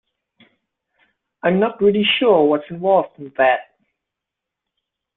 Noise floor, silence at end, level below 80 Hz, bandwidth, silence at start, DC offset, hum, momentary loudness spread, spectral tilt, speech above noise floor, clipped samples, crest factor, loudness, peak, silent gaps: -83 dBFS; 1.55 s; -62 dBFS; 4.1 kHz; 1.45 s; under 0.1%; none; 8 LU; -10 dB/octave; 67 dB; under 0.1%; 18 dB; -17 LUFS; -2 dBFS; none